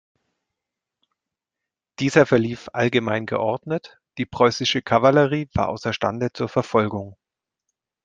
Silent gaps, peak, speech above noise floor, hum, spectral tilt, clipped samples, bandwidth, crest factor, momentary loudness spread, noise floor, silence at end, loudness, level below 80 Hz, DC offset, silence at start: none; -2 dBFS; 65 dB; none; -5.5 dB/octave; under 0.1%; 9.2 kHz; 20 dB; 12 LU; -86 dBFS; 0.9 s; -21 LUFS; -54 dBFS; under 0.1%; 2 s